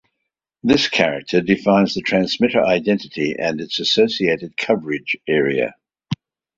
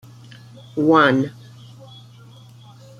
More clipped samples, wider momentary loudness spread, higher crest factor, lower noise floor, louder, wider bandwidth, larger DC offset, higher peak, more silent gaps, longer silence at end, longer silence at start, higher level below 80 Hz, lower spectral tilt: neither; second, 8 LU vs 18 LU; about the same, 18 dB vs 20 dB; first, -79 dBFS vs -44 dBFS; about the same, -18 LUFS vs -17 LUFS; second, 7.8 kHz vs 11 kHz; neither; about the same, -2 dBFS vs -2 dBFS; neither; second, 0.45 s vs 1.7 s; about the same, 0.65 s vs 0.75 s; first, -54 dBFS vs -62 dBFS; second, -5 dB/octave vs -7 dB/octave